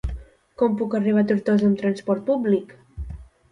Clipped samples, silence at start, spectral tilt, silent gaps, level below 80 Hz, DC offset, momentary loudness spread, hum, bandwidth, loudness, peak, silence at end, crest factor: under 0.1%; 0.05 s; -8.5 dB/octave; none; -40 dBFS; under 0.1%; 19 LU; none; 9.4 kHz; -22 LUFS; -8 dBFS; 0.25 s; 14 dB